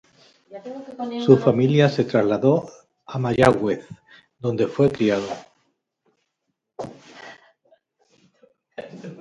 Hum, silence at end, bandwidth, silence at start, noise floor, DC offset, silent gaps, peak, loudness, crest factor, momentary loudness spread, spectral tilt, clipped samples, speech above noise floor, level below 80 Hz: none; 0.05 s; 11 kHz; 0.5 s; -78 dBFS; under 0.1%; none; 0 dBFS; -20 LUFS; 22 dB; 24 LU; -7.5 dB/octave; under 0.1%; 58 dB; -56 dBFS